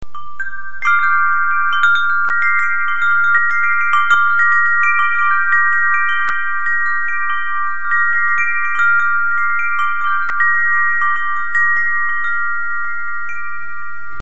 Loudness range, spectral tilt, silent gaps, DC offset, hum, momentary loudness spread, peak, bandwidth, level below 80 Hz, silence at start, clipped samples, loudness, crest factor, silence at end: 3 LU; 2.5 dB/octave; none; 10%; none; 11 LU; 0 dBFS; 8 kHz; -54 dBFS; 0.15 s; under 0.1%; -14 LUFS; 14 dB; 0 s